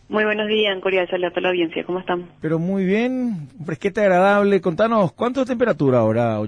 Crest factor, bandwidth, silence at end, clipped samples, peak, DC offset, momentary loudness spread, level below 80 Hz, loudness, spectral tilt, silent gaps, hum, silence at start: 12 dB; 10.5 kHz; 0 s; under 0.1%; -6 dBFS; under 0.1%; 10 LU; -56 dBFS; -19 LUFS; -7 dB/octave; none; none; 0.1 s